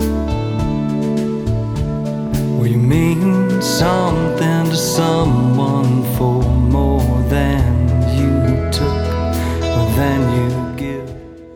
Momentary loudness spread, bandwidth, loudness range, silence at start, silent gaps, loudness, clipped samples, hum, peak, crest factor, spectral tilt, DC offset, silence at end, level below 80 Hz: 6 LU; 19.5 kHz; 2 LU; 0 s; none; -16 LUFS; under 0.1%; none; -2 dBFS; 14 dB; -6.5 dB/octave; under 0.1%; 0 s; -24 dBFS